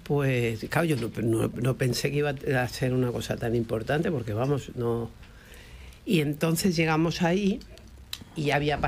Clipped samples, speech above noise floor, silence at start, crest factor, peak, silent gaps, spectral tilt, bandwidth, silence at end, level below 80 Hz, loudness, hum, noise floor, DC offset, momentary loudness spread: under 0.1%; 21 dB; 0 s; 16 dB; -10 dBFS; none; -6 dB/octave; 16 kHz; 0 s; -48 dBFS; -27 LUFS; none; -47 dBFS; under 0.1%; 11 LU